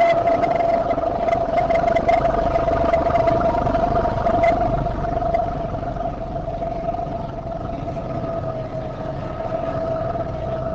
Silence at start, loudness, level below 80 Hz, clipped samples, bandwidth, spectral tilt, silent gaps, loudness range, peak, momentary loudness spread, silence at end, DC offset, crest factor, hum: 0 s; -21 LUFS; -34 dBFS; under 0.1%; 7.6 kHz; -8 dB/octave; none; 8 LU; -8 dBFS; 10 LU; 0 s; under 0.1%; 14 dB; none